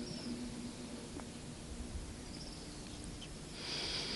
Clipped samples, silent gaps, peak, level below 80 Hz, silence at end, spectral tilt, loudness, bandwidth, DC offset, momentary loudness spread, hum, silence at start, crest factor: under 0.1%; none; -26 dBFS; -54 dBFS; 0 s; -3.5 dB/octave; -45 LUFS; 11.5 kHz; under 0.1%; 9 LU; none; 0 s; 18 dB